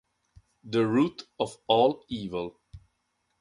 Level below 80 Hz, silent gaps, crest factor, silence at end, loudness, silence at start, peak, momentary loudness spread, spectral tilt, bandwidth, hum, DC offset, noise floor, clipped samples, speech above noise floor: -60 dBFS; none; 22 dB; 0.65 s; -27 LUFS; 0.65 s; -8 dBFS; 12 LU; -6.5 dB/octave; 11.5 kHz; none; under 0.1%; -76 dBFS; under 0.1%; 49 dB